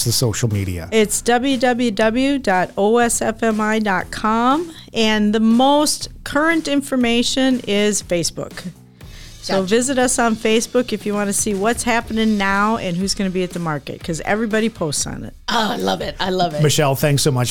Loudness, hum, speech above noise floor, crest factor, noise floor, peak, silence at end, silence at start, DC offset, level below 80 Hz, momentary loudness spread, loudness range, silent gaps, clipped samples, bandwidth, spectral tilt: -18 LUFS; none; 20 dB; 12 dB; -38 dBFS; -6 dBFS; 0 s; 0 s; 1%; -42 dBFS; 7 LU; 3 LU; none; under 0.1%; 19.5 kHz; -4 dB/octave